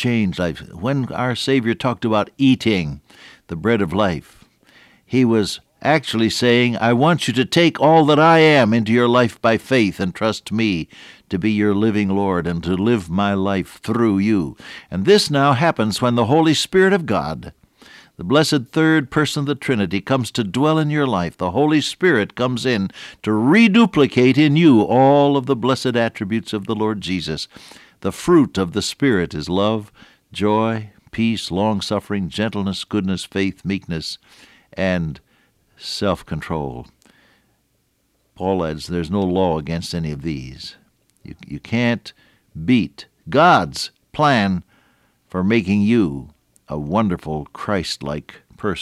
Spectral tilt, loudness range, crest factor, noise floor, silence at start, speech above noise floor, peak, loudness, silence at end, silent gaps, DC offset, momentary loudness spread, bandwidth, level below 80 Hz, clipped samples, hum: -6 dB/octave; 10 LU; 16 dB; -65 dBFS; 0 s; 47 dB; -4 dBFS; -18 LUFS; 0 s; none; under 0.1%; 14 LU; 14.5 kHz; -48 dBFS; under 0.1%; none